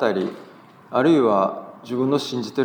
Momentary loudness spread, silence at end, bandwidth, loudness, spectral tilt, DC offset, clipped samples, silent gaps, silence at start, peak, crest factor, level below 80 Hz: 13 LU; 0 s; 19.5 kHz; -21 LUFS; -6.5 dB/octave; under 0.1%; under 0.1%; none; 0 s; -4 dBFS; 16 dB; -78 dBFS